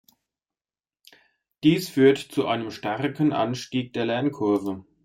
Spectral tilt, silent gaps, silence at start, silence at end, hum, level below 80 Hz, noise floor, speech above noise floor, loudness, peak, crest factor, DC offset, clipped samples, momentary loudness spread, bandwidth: -6 dB/octave; none; 1.65 s; 0.25 s; none; -66 dBFS; under -90 dBFS; over 67 dB; -24 LUFS; -6 dBFS; 18 dB; under 0.1%; under 0.1%; 9 LU; 16 kHz